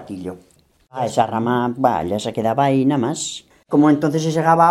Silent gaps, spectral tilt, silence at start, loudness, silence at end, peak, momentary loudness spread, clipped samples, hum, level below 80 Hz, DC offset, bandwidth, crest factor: none; -6 dB/octave; 0 s; -18 LUFS; 0 s; 0 dBFS; 16 LU; under 0.1%; none; -56 dBFS; under 0.1%; 12.5 kHz; 18 dB